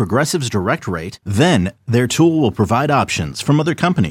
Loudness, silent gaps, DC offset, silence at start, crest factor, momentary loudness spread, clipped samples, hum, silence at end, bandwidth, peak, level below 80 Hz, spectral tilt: -16 LUFS; none; under 0.1%; 0 s; 14 dB; 6 LU; under 0.1%; none; 0 s; 16.5 kHz; -2 dBFS; -44 dBFS; -5.5 dB/octave